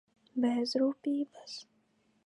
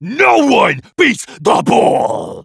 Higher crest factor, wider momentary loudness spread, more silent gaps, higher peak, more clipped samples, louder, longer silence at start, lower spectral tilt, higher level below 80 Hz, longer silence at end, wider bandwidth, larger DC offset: about the same, 16 dB vs 12 dB; first, 15 LU vs 6 LU; neither; second, -18 dBFS vs 0 dBFS; neither; second, -33 LUFS vs -12 LUFS; first, 0.35 s vs 0 s; about the same, -4.5 dB/octave vs -4.5 dB/octave; second, -86 dBFS vs -56 dBFS; first, 0.65 s vs 0 s; about the same, 11.5 kHz vs 11 kHz; neither